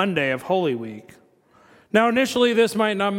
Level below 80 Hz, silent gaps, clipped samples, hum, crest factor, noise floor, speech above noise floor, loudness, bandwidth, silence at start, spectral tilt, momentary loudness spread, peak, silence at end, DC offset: -64 dBFS; none; under 0.1%; none; 18 dB; -56 dBFS; 35 dB; -21 LUFS; 17 kHz; 0 s; -5 dB/octave; 12 LU; -4 dBFS; 0 s; under 0.1%